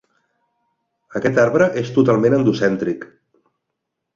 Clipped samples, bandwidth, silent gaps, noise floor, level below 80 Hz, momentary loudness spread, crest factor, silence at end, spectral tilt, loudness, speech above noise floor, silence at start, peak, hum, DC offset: under 0.1%; 7.6 kHz; none; -78 dBFS; -58 dBFS; 10 LU; 18 dB; 1.1 s; -7 dB/octave; -17 LUFS; 62 dB; 1.1 s; -2 dBFS; none; under 0.1%